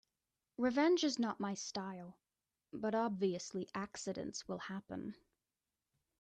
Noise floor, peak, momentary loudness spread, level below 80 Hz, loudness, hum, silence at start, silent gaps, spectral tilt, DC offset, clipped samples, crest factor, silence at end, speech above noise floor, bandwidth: under -90 dBFS; -22 dBFS; 16 LU; -78 dBFS; -39 LUFS; none; 0.6 s; none; -4.5 dB/octave; under 0.1%; under 0.1%; 20 dB; 1.05 s; over 51 dB; 9.4 kHz